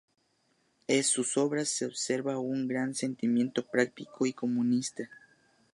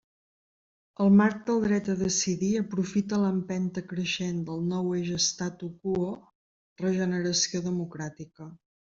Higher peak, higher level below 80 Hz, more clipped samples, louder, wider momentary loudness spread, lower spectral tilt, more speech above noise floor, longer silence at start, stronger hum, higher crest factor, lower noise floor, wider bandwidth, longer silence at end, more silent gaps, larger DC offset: about the same, -12 dBFS vs -12 dBFS; second, -80 dBFS vs -62 dBFS; neither; about the same, -30 LUFS vs -28 LUFS; second, 6 LU vs 12 LU; about the same, -3.5 dB/octave vs -4.5 dB/octave; second, 42 dB vs over 63 dB; about the same, 0.9 s vs 1 s; neither; about the same, 20 dB vs 18 dB; second, -72 dBFS vs under -90 dBFS; first, 11.5 kHz vs 7.8 kHz; first, 0.55 s vs 0.35 s; second, none vs 6.35-6.76 s; neither